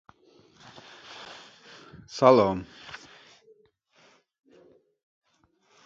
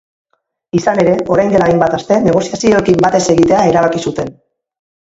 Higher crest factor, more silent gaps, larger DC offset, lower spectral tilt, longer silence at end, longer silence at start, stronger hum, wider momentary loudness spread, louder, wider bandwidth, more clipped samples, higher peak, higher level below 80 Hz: first, 26 dB vs 12 dB; neither; neither; about the same, -6 dB/octave vs -6 dB/octave; first, 2.9 s vs 0.8 s; first, 1.2 s vs 0.75 s; neither; first, 29 LU vs 8 LU; second, -22 LUFS vs -12 LUFS; about the same, 7.6 kHz vs 8 kHz; neither; second, -4 dBFS vs 0 dBFS; second, -62 dBFS vs -42 dBFS